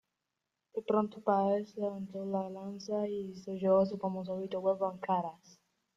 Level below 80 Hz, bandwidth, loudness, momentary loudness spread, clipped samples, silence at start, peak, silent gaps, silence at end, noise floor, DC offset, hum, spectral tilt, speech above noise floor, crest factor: -76 dBFS; 7.4 kHz; -34 LUFS; 12 LU; under 0.1%; 0.75 s; -16 dBFS; none; 0.6 s; -87 dBFS; under 0.1%; none; -8 dB/octave; 54 dB; 18 dB